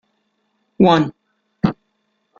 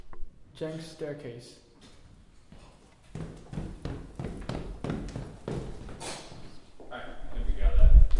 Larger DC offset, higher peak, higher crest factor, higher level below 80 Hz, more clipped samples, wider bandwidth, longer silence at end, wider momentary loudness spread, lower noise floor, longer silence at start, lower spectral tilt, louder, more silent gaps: neither; first, -2 dBFS vs -6 dBFS; about the same, 20 dB vs 20 dB; second, -50 dBFS vs -28 dBFS; neither; second, 7.2 kHz vs 11 kHz; first, 0.65 s vs 0 s; second, 11 LU vs 21 LU; first, -69 dBFS vs -54 dBFS; first, 0.8 s vs 0.05 s; about the same, -7.5 dB/octave vs -6.5 dB/octave; first, -17 LUFS vs -34 LUFS; neither